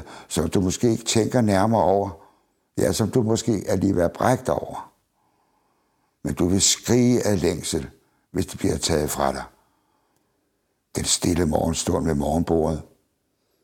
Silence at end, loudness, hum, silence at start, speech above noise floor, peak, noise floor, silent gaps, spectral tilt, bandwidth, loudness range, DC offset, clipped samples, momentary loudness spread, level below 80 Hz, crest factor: 0.8 s; -22 LUFS; none; 0 s; 50 dB; -2 dBFS; -72 dBFS; none; -4.5 dB/octave; 17 kHz; 4 LU; under 0.1%; under 0.1%; 13 LU; -42 dBFS; 20 dB